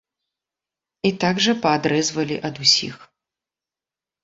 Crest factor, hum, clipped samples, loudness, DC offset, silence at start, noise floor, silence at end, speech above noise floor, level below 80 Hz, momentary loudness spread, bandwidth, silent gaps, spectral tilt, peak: 20 dB; none; under 0.1%; -19 LUFS; under 0.1%; 1.05 s; -90 dBFS; 1.2 s; 69 dB; -62 dBFS; 9 LU; 8 kHz; none; -3.5 dB/octave; -2 dBFS